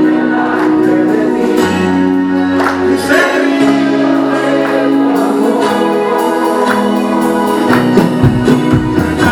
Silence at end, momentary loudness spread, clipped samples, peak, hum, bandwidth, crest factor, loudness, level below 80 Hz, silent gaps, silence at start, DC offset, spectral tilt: 0 s; 3 LU; 0.2%; 0 dBFS; none; 18 kHz; 10 dB; -11 LUFS; -36 dBFS; none; 0 s; under 0.1%; -6.5 dB/octave